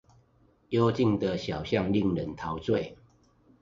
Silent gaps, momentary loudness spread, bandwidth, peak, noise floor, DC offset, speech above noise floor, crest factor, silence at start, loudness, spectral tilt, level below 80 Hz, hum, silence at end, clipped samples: none; 8 LU; 7.6 kHz; -12 dBFS; -64 dBFS; under 0.1%; 37 dB; 18 dB; 0.7 s; -29 LUFS; -7.5 dB/octave; -52 dBFS; none; 0.7 s; under 0.1%